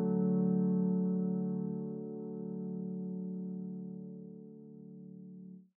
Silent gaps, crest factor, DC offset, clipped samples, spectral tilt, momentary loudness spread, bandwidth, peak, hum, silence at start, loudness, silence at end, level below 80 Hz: none; 14 dB; under 0.1%; under 0.1%; -12.5 dB/octave; 20 LU; 1.6 kHz; -22 dBFS; none; 0 s; -36 LUFS; 0.15 s; under -90 dBFS